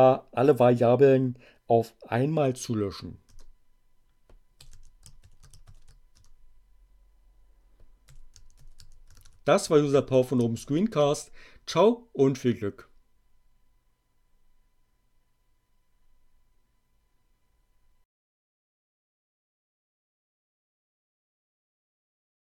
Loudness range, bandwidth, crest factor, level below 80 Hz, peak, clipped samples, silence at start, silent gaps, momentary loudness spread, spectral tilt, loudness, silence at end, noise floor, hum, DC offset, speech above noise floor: 11 LU; 14.5 kHz; 22 dB; -56 dBFS; -6 dBFS; under 0.1%; 0 s; none; 13 LU; -6.5 dB/octave; -25 LUFS; 9.75 s; -68 dBFS; none; under 0.1%; 45 dB